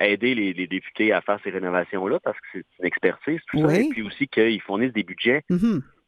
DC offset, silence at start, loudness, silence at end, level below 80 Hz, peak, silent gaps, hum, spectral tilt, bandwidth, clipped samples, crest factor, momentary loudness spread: under 0.1%; 0 s; -23 LUFS; 0.25 s; -58 dBFS; -4 dBFS; none; none; -7 dB/octave; 12.5 kHz; under 0.1%; 20 dB; 8 LU